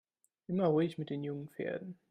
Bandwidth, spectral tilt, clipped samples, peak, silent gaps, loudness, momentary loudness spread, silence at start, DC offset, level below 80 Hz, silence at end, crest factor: 13.5 kHz; -9 dB/octave; under 0.1%; -18 dBFS; none; -36 LUFS; 12 LU; 0.5 s; under 0.1%; -78 dBFS; 0.15 s; 18 dB